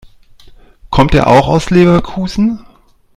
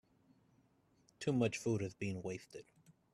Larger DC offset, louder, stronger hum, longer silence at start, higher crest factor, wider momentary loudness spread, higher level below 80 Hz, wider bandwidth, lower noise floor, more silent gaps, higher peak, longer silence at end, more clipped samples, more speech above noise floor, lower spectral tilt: neither; first, -11 LUFS vs -40 LUFS; neither; second, 0.9 s vs 1.2 s; second, 12 dB vs 20 dB; second, 9 LU vs 16 LU; first, -28 dBFS vs -74 dBFS; second, 11.5 kHz vs 13.5 kHz; second, -46 dBFS vs -73 dBFS; neither; first, 0 dBFS vs -22 dBFS; first, 0.55 s vs 0.25 s; first, 0.4% vs under 0.1%; about the same, 36 dB vs 34 dB; about the same, -7 dB/octave vs -6 dB/octave